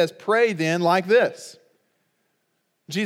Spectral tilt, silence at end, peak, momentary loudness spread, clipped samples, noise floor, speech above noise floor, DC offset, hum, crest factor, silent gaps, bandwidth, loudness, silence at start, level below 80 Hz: -5 dB/octave; 0 s; -6 dBFS; 17 LU; under 0.1%; -72 dBFS; 52 dB; under 0.1%; none; 18 dB; none; 15.5 kHz; -21 LUFS; 0 s; -86 dBFS